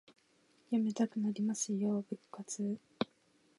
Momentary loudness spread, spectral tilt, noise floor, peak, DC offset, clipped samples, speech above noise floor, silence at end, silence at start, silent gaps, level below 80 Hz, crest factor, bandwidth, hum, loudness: 9 LU; -5 dB/octave; -71 dBFS; -18 dBFS; under 0.1%; under 0.1%; 35 dB; 0.55 s; 0.7 s; none; -84 dBFS; 20 dB; 11.5 kHz; none; -37 LUFS